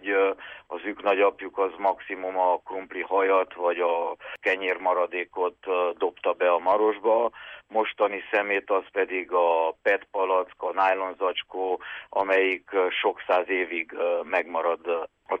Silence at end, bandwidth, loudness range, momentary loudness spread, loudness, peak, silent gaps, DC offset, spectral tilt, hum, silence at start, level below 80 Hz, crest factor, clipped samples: 0 s; 5.6 kHz; 1 LU; 8 LU; -26 LUFS; -10 dBFS; none; under 0.1%; -4.5 dB/octave; none; 0.05 s; -70 dBFS; 14 dB; under 0.1%